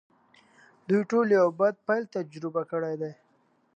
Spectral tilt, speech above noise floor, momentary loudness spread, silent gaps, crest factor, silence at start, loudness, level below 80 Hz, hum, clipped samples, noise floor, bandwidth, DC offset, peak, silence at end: -7.5 dB/octave; 41 dB; 13 LU; none; 16 dB; 0.9 s; -27 LUFS; -82 dBFS; none; under 0.1%; -67 dBFS; 8.6 kHz; under 0.1%; -12 dBFS; 0.65 s